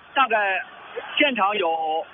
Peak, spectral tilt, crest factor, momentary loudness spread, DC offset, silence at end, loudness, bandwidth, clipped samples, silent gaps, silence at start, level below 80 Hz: -6 dBFS; 1 dB/octave; 18 dB; 11 LU; under 0.1%; 0 s; -22 LUFS; 3.8 kHz; under 0.1%; none; 0.15 s; -72 dBFS